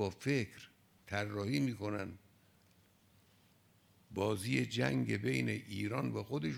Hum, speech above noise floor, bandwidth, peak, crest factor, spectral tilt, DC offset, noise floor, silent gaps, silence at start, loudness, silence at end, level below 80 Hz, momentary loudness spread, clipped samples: none; 32 dB; 16.5 kHz; -18 dBFS; 20 dB; -6 dB/octave; under 0.1%; -69 dBFS; none; 0 s; -37 LUFS; 0 s; -74 dBFS; 12 LU; under 0.1%